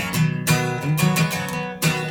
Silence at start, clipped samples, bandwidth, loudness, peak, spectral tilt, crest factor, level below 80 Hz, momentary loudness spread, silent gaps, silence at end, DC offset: 0 s; under 0.1%; 18 kHz; -21 LUFS; -4 dBFS; -4.5 dB/octave; 16 dB; -50 dBFS; 4 LU; none; 0 s; under 0.1%